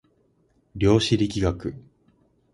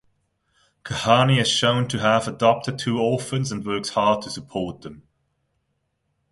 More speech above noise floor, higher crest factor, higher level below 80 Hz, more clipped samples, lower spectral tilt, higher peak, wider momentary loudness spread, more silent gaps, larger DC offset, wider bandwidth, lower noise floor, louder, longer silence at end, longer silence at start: second, 43 dB vs 52 dB; about the same, 20 dB vs 22 dB; first, -42 dBFS vs -54 dBFS; neither; about the same, -6 dB/octave vs -5 dB/octave; second, -6 dBFS vs -2 dBFS; about the same, 15 LU vs 13 LU; neither; neither; about the same, 11.5 kHz vs 11.5 kHz; second, -65 dBFS vs -73 dBFS; about the same, -23 LUFS vs -21 LUFS; second, 0.75 s vs 1.3 s; about the same, 0.75 s vs 0.85 s